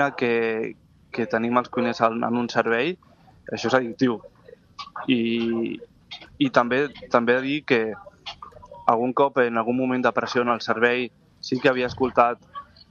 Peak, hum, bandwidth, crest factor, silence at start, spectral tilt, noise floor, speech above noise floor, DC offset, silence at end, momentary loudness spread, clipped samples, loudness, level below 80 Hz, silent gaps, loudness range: -2 dBFS; none; 7.2 kHz; 22 dB; 0 s; -5.5 dB/octave; -43 dBFS; 21 dB; under 0.1%; 0.25 s; 17 LU; under 0.1%; -23 LUFS; -60 dBFS; none; 3 LU